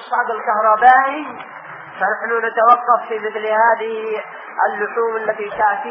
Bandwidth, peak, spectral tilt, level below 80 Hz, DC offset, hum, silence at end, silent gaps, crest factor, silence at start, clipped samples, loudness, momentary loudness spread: 5.2 kHz; 0 dBFS; -1 dB/octave; -66 dBFS; under 0.1%; none; 0 s; none; 18 dB; 0 s; under 0.1%; -16 LUFS; 16 LU